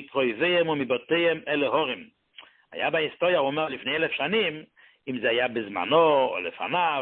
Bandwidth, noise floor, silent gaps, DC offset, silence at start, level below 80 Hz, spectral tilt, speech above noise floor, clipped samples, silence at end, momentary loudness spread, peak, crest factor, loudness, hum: 4.3 kHz; -53 dBFS; none; under 0.1%; 0 s; -68 dBFS; -9 dB/octave; 28 dB; under 0.1%; 0 s; 9 LU; -6 dBFS; 18 dB; -25 LUFS; none